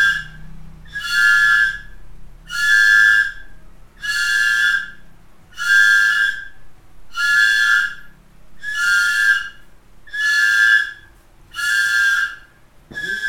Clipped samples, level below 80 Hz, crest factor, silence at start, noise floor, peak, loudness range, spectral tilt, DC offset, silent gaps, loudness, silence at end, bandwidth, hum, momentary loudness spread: under 0.1%; -46 dBFS; 16 dB; 0 s; -47 dBFS; -2 dBFS; 2 LU; 1.5 dB/octave; under 0.1%; none; -15 LUFS; 0 s; 18.5 kHz; none; 19 LU